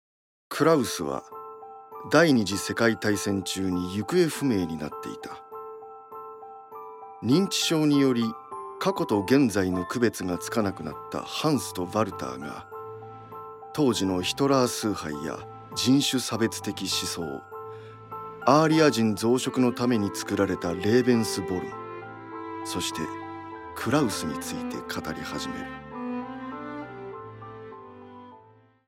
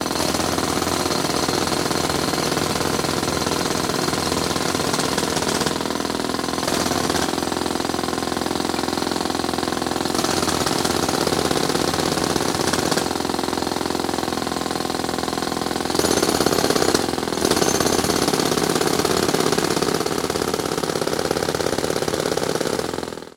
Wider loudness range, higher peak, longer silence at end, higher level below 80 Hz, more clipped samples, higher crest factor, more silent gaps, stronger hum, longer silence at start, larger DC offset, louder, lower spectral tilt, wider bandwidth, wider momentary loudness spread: first, 7 LU vs 3 LU; second, -4 dBFS vs 0 dBFS; first, 0.5 s vs 0.05 s; second, -64 dBFS vs -44 dBFS; neither; about the same, 22 dB vs 20 dB; neither; neither; first, 0.5 s vs 0 s; neither; second, -26 LUFS vs -21 LUFS; about the same, -4.5 dB/octave vs -3.5 dB/octave; about the same, 16.5 kHz vs 16.5 kHz; first, 20 LU vs 5 LU